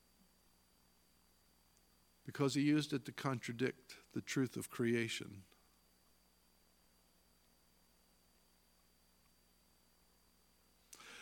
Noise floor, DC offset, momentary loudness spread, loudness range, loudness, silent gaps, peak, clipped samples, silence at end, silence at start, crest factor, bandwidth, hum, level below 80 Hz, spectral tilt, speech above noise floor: -73 dBFS; under 0.1%; 20 LU; 6 LU; -39 LUFS; none; -22 dBFS; under 0.1%; 0 s; 2.25 s; 24 dB; 17.5 kHz; 60 Hz at -70 dBFS; -80 dBFS; -5 dB/octave; 34 dB